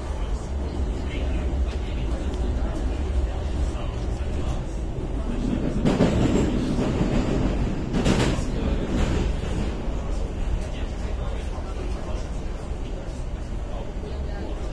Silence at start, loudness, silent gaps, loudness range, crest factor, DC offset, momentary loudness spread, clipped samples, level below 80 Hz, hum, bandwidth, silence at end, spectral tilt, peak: 0 s; -27 LUFS; none; 8 LU; 18 dB; under 0.1%; 11 LU; under 0.1%; -28 dBFS; none; 11 kHz; 0 s; -6.5 dB/octave; -6 dBFS